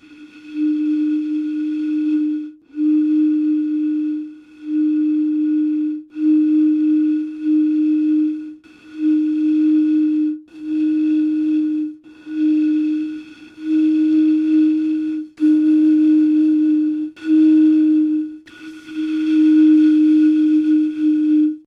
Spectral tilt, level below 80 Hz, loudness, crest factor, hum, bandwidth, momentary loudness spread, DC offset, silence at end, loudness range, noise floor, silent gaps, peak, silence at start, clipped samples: -6.5 dB/octave; -68 dBFS; -17 LUFS; 10 dB; none; 4.7 kHz; 12 LU; under 0.1%; 0.05 s; 4 LU; -40 dBFS; none; -6 dBFS; 0.1 s; under 0.1%